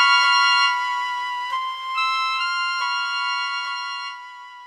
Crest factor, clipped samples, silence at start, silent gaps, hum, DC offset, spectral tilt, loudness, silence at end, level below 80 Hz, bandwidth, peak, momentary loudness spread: 18 dB; under 0.1%; 0 s; none; none; under 0.1%; 4 dB/octave; -21 LUFS; 0 s; -72 dBFS; 15 kHz; -4 dBFS; 13 LU